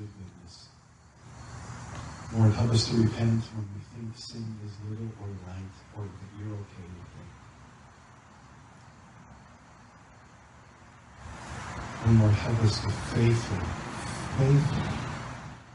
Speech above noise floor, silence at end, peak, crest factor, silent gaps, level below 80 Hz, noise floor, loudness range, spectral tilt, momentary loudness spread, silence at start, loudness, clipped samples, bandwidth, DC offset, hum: 28 dB; 0 s; -10 dBFS; 20 dB; none; -48 dBFS; -56 dBFS; 19 LU; -6.5 dB/octave; 23 LU; 0 s; -29 LUFS; under 0.1%; 11 kHz; under 0.1%; none